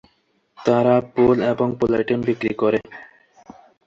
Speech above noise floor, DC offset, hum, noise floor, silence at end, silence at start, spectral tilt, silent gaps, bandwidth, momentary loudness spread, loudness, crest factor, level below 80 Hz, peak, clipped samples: 46 dB; under 0.1%; none; -65 dBFS; 0.85 s; 0.6 s; -8 dB/octave; none; 7.4 kHz; 8 LU; -19 LUFS; 18 dB; -52 dBFS; -4 dBFS; under 0.1%